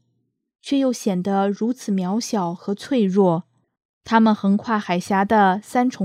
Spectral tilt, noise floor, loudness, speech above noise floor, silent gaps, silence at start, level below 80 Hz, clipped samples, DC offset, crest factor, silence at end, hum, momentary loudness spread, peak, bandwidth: -6 dB/octave; -71 dBFS; -20 LUFS; 52 dB; 3.85-4.01 s; 0.65 s; -64 dBFS; under 0.1%; under 0.1%; 16 dB; 0 s; none; 8 LU; -4 dBFS; 14.5 kHz